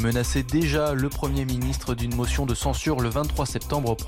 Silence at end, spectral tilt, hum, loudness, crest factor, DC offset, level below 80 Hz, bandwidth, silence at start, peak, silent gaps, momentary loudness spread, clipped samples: 0 s; -5.5 dB/octave; none; -25 LUFS; 12 dB; under 0.1%; -32 dBFS; 17 kHz; 0 s; -12 dBFS; none; 4 LU; under 0.1%